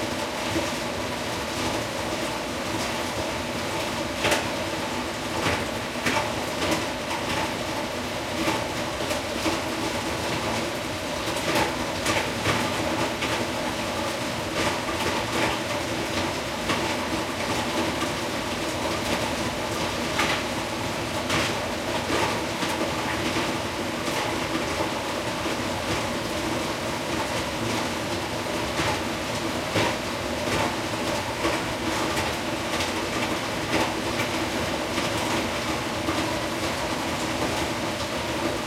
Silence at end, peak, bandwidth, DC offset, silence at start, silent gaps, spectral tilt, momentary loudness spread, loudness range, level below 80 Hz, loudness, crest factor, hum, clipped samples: 0 s; -8 dBFS; 16.5 kHz; under 0.1%; 0 s; none; -3.5 dB/octave; 4 LU; 1 LU; -48 dBFS; -26 LUFS; 18 dB; none; under 0.1%